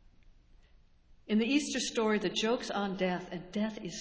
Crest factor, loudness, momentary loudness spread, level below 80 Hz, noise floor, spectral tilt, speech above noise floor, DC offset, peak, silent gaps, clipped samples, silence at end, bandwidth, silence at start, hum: 16 dB; -32 LUFS; 7 LU; -62 dBFS; -62 dBFS; -4 dB/octave; 29 dB; under 0.1%; -16 dBFS; none; under 0.1%; 0 s; 8 kHz; 1.1 s; none